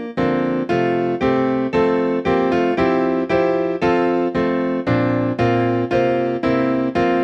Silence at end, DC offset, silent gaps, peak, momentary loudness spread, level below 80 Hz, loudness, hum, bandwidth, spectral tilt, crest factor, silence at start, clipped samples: 0 s; under 0.1%; none; -6 dBFS; 2 LU; -46 dBFS; -18 LUFS; none; 7 kHz; -8 dB/octave; 12 dB; 0 s; under 0.1%